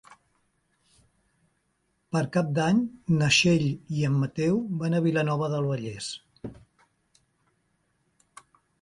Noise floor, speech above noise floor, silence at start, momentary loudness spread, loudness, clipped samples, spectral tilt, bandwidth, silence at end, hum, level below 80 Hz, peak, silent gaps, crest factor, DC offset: -74 dBFS; 49 dB; 2.15 s; 16 LU; -26 LUFS; under 0.1%; -5.5 dB/octave; 11.5 kHz; 2.3 s; none; -60 dBFS; -8 dBFS; none; 20 dB; under 0.1%